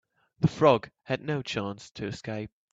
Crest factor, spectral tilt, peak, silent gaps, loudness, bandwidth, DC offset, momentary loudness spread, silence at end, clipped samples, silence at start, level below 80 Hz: 22 dB; -6.5 dB/octave; -6 dBFS; 1.91-1.95 s; -29 LUFS; 8 kHz; under 0.1%; 14 LU; 0.25 s; under 0.1%; 0.4 s; -60 dBFS